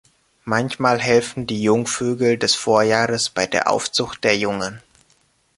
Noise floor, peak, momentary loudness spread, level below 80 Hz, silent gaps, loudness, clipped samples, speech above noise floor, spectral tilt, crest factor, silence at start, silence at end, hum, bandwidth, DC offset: -61 dBFS; -2 dBFS; 7 LU; -56 dBFS; none; -19 LUFS; under 0.1%; 42 dB; -3.5 dB/octave; 18 dB; 0.45 s; 0.8 s; none; 11.5 kHz; under 0.1%